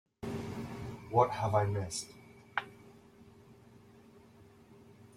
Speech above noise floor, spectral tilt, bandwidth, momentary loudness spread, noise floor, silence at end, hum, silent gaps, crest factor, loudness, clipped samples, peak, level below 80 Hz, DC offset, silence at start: 28 dB; -5.5 dB/octave; 14.5 kHz; 21 LU; -59 dBFS; 0.15 s; none; none; 26 dB; -35 LUFS; under 0.1%; -12 dBFS; -64 dBFS; under 0.1%; 0.2 s